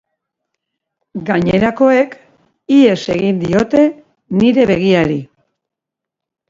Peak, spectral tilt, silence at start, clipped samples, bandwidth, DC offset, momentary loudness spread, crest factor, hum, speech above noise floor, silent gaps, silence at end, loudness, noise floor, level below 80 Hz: 0 dBFS; -7 dB/octave; 1.15 s; under 0.1%; 7.6 kHz; under 0.1%; 10 LU; 14 dB; none; 71 dB; none; 1.25 s; -13 LUFS; -83 dBFS; -46 dBFS